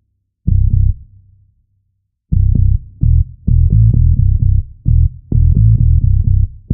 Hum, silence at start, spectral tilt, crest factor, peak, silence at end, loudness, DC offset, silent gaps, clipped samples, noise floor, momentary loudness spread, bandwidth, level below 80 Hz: none; 0.45 s; -17 dB/octave; 12 dB; 0 dBFS; 0 s; -14 LUFS; under 0.1%; none; under 0.1%; -66 dBFS; 7 LU; 0.7 kHz; -14 dBFS